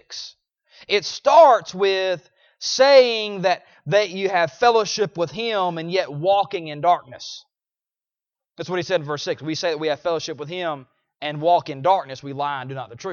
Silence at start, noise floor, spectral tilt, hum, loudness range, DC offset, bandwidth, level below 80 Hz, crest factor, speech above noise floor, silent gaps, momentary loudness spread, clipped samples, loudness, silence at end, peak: 0.1 s; under -90 dBFS; -4 dB/octave; none; 9 LU; under 0.1%; 7.2 kHz; -68 dBFS; 20 dB; over 70 dB; none; 17 LU; under 0.1%; -20 LUFS; 0 s; -2 dBFS